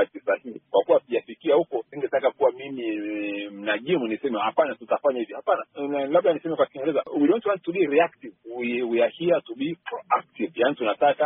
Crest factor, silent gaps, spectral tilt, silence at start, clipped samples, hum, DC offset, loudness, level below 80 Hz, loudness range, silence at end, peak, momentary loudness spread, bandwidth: 16 dB; none; -3.5 dB/octave; 0 s; under 0.1%; none; under 0.1%; -25 LUFS; -72 dBFS; 2 LU; 0 s; -8 dBFS; 9 LU; 3.9 kHz